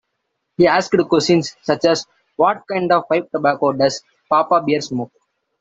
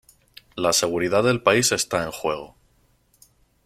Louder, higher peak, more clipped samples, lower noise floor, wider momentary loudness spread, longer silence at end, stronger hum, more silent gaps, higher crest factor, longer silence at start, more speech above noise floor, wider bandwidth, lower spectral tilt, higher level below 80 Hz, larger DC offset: first, -17 LUFS vs -21 LUFS; about the same, 0 dBFS vs -2 dBFS; neither; first, -74 dBFS vs -62 dBFS; about the same, 11 LU vs 10 LU; second, 0.55 s vs 1.2 s; neither; neither; about the same, 18 dB vs 22 dB; about the same, 0.6 s vs 0.55 s; first, 57 dB vs 41 dB; second, 8 kHz vs 16 kHz; first, -5 dB/octave vs -3 dB/octave; about the same, -58 dBFS vs -56 dBFS; neither